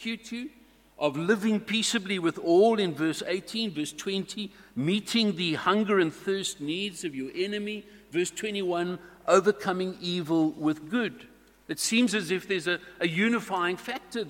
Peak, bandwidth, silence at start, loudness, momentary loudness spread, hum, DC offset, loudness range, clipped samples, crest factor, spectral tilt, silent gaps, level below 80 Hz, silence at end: -8 dBFS; 17 kHz; 0 s; -28 LUFS; 11 LU; none; under 0.1%; 2 LU; under 0.1%; 20 dB; -4 dB/octave; none; -68 dBFS; 0 s